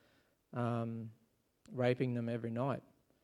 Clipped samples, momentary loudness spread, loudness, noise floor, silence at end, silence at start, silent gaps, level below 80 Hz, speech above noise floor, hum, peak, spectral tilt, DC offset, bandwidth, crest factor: under 0.1%; 13 LU; -39 LUFS; -73 dBFS; 0.4 s; 0.55 s; none; -78 dBFS; 36 dB; none; -18 dBFS; -8.5 dB/octave; under 0.1%; 11 kHz; 20 dB